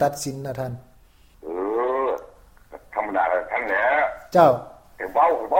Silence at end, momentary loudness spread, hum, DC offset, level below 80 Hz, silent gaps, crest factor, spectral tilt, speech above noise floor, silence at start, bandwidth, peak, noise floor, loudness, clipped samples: 0 s; 15 LU; none; under 0.1%; -54 dBFS; none; 20 dB; -5.5 dB/octave; 33 dB; 0 s; 17 kHz; -2 dBFS; -53 dBFS; -22 LUFS; under 0.1%